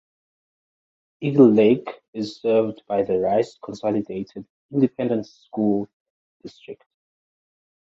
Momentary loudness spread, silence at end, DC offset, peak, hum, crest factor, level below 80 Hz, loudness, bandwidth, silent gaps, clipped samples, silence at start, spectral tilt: 22 LU; 1.2 s; under 0.1%; -2 dBFS; none; 20 dB; -64 dBFS; -21 LUFS; 7.8 kHz; 2.08-2.13 s, 4.50-4.69 s, 5.93-6.40 s; under 0.1%; 1.2 s; -8 dB/octave